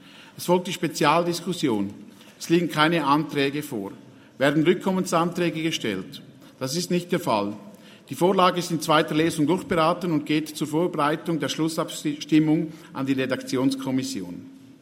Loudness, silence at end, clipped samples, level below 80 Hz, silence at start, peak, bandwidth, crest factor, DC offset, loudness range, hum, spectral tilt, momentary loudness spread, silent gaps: -24 LUFS; 0.1 s; under 0.1%; -64 dBFS; 0.15 s; -2 dBFS; 16 kHz; 22 dB; under 0.1%; 3 LU; none; -5 dB/octave; 13 LU; none